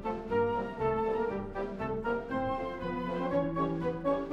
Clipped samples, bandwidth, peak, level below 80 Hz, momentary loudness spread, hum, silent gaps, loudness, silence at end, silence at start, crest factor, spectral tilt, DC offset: under 0.1%; 7.8 kHz; -18 dBFS; -50 dBFS; 5 LU; none; none; -33 LUFS; 0 s; 0 s; 14 dB; -8.5 dB/octave; under 0.1%